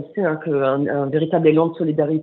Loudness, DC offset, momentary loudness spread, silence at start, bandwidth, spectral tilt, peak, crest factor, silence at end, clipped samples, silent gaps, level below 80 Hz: -19 LUFS; under 0.1%; 5 LU; 0 s; 4.1 kHz; -7 dB/octave; -2 dBFS; 16 dB; 0 s; under 0.1%; none; -68 dBFS